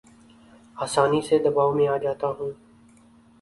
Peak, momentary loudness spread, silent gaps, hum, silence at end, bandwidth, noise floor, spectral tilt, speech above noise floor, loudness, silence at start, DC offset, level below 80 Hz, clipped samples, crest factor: -6 dBFS; 12 LU; none; none; 0.9 s; 11.5 kHz; -54 dBFS; -5.5 dB/octave; 32 dB; -23 LUFS; 0.75 s; under 0.1%; -62 dBFS; under 0.1%; 20 dB